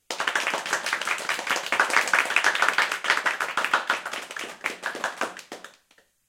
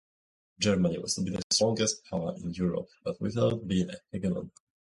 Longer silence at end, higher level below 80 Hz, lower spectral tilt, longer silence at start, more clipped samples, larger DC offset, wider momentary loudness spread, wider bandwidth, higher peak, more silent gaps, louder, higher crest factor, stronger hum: first, 0.6 s vs 0.45 s; second, -76 dBFS vs -56 dBFS; second, 0.5 dB/octave vs -4.5 dB/octave; second, 0.1 s vs 0.6 s; neither; neither; first, 12 LU vs 9 LU; first, 17 kHz vs 11.5 kHz; first, -2 dBFS vs -12 dBFS; second, none vs 1.44-1.50 s; first, -24 LUFS vs -30 LUFS; first, 26 dB vs 18 dB; neither